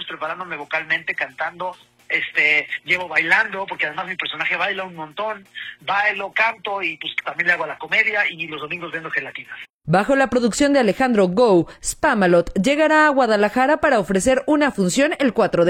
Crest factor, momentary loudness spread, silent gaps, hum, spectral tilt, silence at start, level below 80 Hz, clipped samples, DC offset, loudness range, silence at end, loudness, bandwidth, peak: 16 dB; 12 LU; 9.74-9.79 s; none; -4.5 dB/octave; 0 s; -48 dBFS; under 0.1%; under 0.1%; 5 LU; 0 s; -19 LUFS; 16 kHz; -2 dBFS